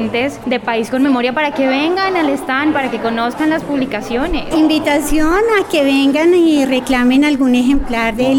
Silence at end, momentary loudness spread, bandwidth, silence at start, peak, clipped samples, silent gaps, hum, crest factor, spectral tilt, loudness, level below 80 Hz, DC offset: 0 s; 6 LU; 17 kHz; 0 s; -4 dBFS; under 0.1%; none; none; 10 dB; -4.5 dB/octave; -14 LUFS; -32 dBFS; under 0.1%